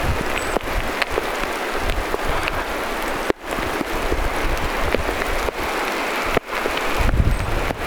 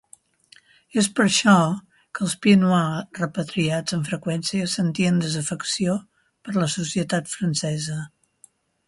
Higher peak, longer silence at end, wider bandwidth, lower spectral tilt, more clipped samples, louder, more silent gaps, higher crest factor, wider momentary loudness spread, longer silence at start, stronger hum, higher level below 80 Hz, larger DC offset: about the same, -2 dBFS vs -4 dBFS; second, 0 s vs 0.8 s; first, over 20 kHz vs 11.5 kHz; about the same, -4.5 dB/octave vs -4.5 dB/octave; neither; about the same, -22 LUFS vs -22 LUFS; neither; about the same, 20 dB vs 20 dB; second, 3 LU vs 11 LU; second, 0 s vs 0.95 s; neither; first, -26 dBFS vs -62 dBFS; neither